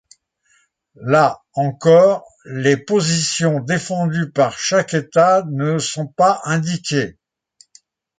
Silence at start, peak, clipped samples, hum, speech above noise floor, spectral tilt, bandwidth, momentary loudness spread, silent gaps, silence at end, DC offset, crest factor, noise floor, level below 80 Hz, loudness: 1 s; -2 dBFS; under 0.1%; none; 44 dB; -5 dB/octave; 9.6 kHz; 9 LU; none; 1.1 s; under 0.1%; 16 dB; -61 dBFS; -60 dBFS; -17 LUFS